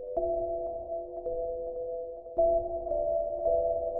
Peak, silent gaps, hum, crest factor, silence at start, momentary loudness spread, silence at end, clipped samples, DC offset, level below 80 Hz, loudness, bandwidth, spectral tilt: -16 dBFS; none; none; 14 dB; 0 s; 9 LU; 0 s; under 0.1%; under 0.1%; -48 dBFS; -32 LUFS; 1.3 kHz; -13 dB/octave